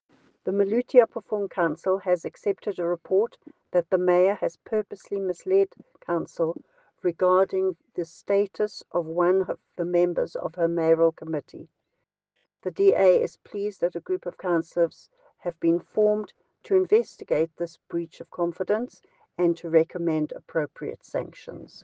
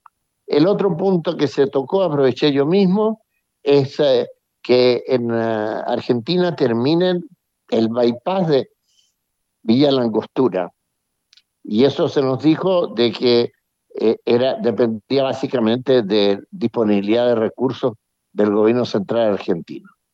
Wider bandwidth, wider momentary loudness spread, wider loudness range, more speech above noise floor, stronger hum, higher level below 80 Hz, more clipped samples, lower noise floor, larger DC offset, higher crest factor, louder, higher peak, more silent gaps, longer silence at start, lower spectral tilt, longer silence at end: about the same, 7.8 kHz vs 7.6 kHz; first, 13 LU vs 8 LU; about the same, 2 LU vs 2 LU; about the same, 55 dB vs 57 dB; neither; about the same, -74 dBFS vs -70 dBFS; neither; first, -80 dBFS vs -74 dBFS; neither; first, 22 dB vs 16 dB; second, -26 LUFS vs -18 LUFS; about the same, -4 dBFS vs -2 dBFS; neither; about the same, 0.45 s vs 0.5 s; about the same, -7.5 dB/octave vs -7.5 dB/octave; second, 0.2 s vs 0.35 s